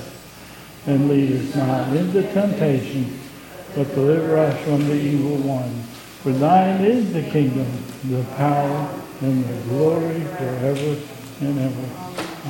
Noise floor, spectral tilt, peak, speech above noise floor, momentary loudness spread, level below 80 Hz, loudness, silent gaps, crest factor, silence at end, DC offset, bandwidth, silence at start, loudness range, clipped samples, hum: -40 dBFS; -7.5 dB/octave; -4 dBFS; 20 dB; 13 LU; -56 dBFS; -21 LUFS; none; 18 dB; 0 s; under 0.1%; 17 kHz; 0 s; 3 LU; under 0.1%; none